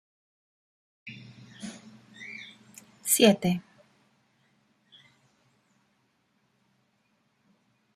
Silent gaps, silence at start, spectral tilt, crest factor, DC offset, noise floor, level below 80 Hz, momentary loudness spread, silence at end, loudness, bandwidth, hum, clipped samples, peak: none; 1.05 s; -3.5 dB/octave; 28 dB; under 0.1%; -72 dBFS; -74 dBFS; 28 LU; 4.35 s; -24 LUFS; 16 kHz; none; under 0.1%; -6 dBFS